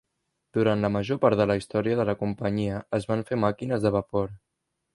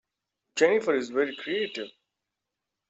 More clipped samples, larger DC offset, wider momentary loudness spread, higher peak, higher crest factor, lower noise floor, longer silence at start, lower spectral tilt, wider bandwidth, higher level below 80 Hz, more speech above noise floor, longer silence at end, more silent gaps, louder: neither; neither; second, 7 LU vs 14 LU; about the same, -6 dBFS vs -6 dBFS; about the same, 20 dB vs 22 dB; second, -79 dBFS vs -86 dBFS; about the same, 0.55 s vs 0.55 s; first, -7.5 dB/octave vs -3.5 dB/octave; first, 11.5 kHz vs 8.2 kHz; first, -54 dBFS vs -78 dBFS; second, 54 dB vs 60 dB; second, 0.6 s vs 1 s; neither; about the same, -26 LUFS vs -27 LUFS